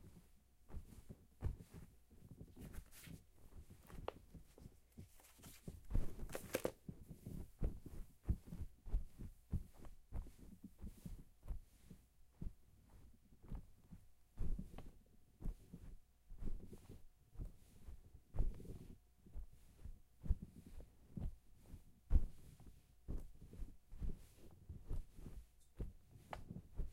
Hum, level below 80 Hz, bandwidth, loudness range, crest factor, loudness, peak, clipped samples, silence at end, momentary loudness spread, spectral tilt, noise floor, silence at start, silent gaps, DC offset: none; -50 dBFS; 16 kHz; 9 LU; 28 dB; -53 LUFS; -20 dBFS; under 0.1%; 0 s; 18 LU; -6.5 dB/octave; -68 dBFS; 0 s; none; under 0.1%